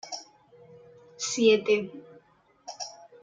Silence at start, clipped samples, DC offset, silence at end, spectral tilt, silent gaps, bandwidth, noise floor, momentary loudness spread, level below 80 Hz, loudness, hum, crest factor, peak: 0.05 s; under 0.1%; under 0.1%; 0.3 s; -3 dB/octave; none; 9.4 kHz; -61 dBFS; 23 LU; -78 dBFS; -26 LUFS; none; 20 dB; -10 dBFS